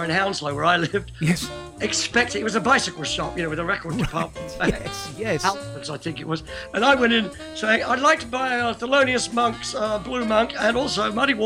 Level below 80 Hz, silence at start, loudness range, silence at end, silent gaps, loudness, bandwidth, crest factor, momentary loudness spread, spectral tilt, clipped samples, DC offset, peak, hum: -46 dBFS; 0 s; 5 LU; 0 s; none; -22 LUFS; 16 kHz; 18 dB; 11 LU; -4 dB/octave; under 0.1%; under 0.1%; -4 dBFS; none